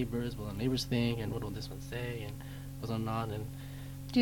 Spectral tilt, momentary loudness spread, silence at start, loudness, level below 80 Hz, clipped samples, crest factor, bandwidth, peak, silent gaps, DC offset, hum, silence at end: -6 dB/octave; 12 LU; 0 s; -37 LUFS; -50 dBFS; under 0.1%; 18 dB; 18.5 kHz; -18 dBFS; none; under 0.1%; none; 0 s